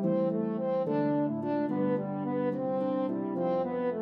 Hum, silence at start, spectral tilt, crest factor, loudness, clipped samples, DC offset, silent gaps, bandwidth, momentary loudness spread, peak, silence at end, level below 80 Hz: none; 0 s; -11 dB/octave; 12 dB; -30 LUFS; under 0.1%; under 0.1%; none; 5.2 kHz; 3 LU; -18 dBFS; 0 s; -80 dBFS